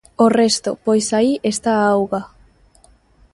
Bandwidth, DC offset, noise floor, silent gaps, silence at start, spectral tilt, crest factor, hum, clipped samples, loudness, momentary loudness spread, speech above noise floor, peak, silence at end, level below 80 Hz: 11.5 kHz; under 0.1%; -52 dBFS; none; 0.2 s; -4 dB/octave; 18 dB; none; under 0.1%; -17 LUFS; 5 LU; 36 dB; -2 dBFS; 1.1 s; -54 dBFS